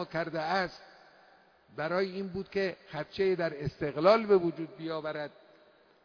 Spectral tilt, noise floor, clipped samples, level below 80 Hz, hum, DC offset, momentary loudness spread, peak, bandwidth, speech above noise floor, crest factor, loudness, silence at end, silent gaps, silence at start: -4.5 dB/octave; -62 dBFS; under 0.1%; -64 dBFS; none; under 0.1%; 15 LU; -10 dBFS; 5.4 kHz; 31 dB; 22 dB; -31 LUFS; 0.75 s; none; 0 s